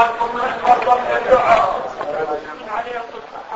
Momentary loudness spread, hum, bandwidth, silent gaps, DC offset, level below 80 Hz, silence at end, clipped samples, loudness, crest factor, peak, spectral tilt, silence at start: 14 LU; none; 8 kHz; none; under 0.1%; -48 dBFS; 0 s; under 0.1%; -18 LUFS; 18 dB; 0 dBFS; -4.5 dB/octave; 0 s